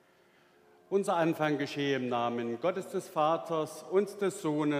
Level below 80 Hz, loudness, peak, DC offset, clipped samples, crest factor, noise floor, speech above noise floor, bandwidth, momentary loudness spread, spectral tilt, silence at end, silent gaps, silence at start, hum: -86 dBFS; -32 LUFS; -14 dBFS; under 0.1%; under 0.1%; 16 dB; -64 dBFS; 33 dB; 15.5 kHz; 5 LU; -5.5 dB/octave; 0 s; none; 0.9 s; none